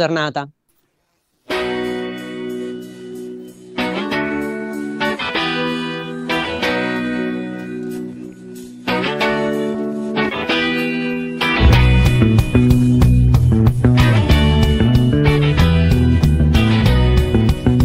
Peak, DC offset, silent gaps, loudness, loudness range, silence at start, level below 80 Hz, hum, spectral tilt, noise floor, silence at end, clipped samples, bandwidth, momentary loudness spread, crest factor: 0 dBFS; under 0.1%; none; -16 LUFS; 11 LU; 0 s; -22 dBFS; none; -7 dB/octave; -66 dBFS; 0 s; under 0.1%; 15.5 kHz; 15 LU; 14 dB